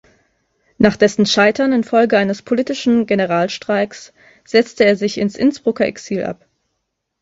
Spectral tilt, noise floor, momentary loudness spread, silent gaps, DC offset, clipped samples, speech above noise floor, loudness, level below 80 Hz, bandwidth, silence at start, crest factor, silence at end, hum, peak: -5 dB/octave; -74 dBFS; 10 LU; none; under 0.1%; under 0.1%; 58 dB; -16 LUFS; -54 dBFS; 8 kHz; 0.8 s; 16 dB; 0.9 s; none; 0 dBFS